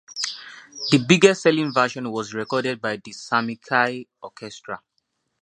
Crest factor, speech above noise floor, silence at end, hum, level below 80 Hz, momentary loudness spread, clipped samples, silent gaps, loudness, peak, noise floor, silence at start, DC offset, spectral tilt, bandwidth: 22 dB; 52 dB; 0.65 s; none; -66 dBFS; 21 LU; under 0.1%; none; -21 LUFS; 0 dBFS; -73 dBFS; 0.1 s; under 0.1%; -4.5 dB/octave; 11 kHz